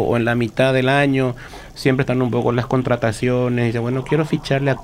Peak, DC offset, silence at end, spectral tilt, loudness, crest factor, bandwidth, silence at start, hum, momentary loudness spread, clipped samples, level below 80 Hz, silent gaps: -4 dBFS; under 0.1%; 0 s; -7 dB/octave; -19 LUFS; 14 dB; 14.5 kHz; 0 s; none; 6 LU; under 0.1%; -42 dBFS; none